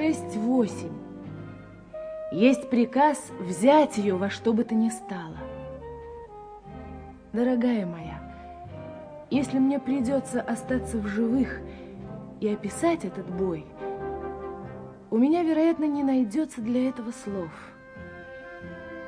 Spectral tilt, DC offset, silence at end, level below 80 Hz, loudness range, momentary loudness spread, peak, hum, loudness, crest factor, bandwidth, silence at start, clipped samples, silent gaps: -6 dB/octave; under 0.1%; 0 s; -52 dBFS; 7 LU; 20 LU; -6 dBFS; none; -26 LUFS; 20 dB; 10.5 kHz; 0 s; under 0.1%; none